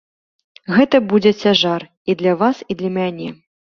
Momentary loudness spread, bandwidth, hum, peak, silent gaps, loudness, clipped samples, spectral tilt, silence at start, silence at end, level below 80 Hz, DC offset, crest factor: 11 LU; 6.8 kHz; none; -2 dBFS; 1.97-2.05 s; -16 LUFS; under 0.1%; -6 dB/octave; 0.7 s; 0.35 s; -58 dBFS; under 0.1%; 16 dB